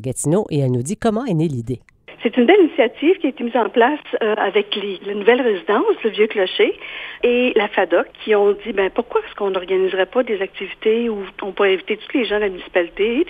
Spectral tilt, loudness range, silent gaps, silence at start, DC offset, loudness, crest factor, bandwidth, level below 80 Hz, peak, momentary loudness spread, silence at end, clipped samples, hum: -5.5 dB/octave; 3 LU; none; 0 s; under 0.1%; -18 LUFS; 18 dB; 13 kHz; -52 dBFS; 0 dBFS; 8 LU; 0 s; under 0.1%; none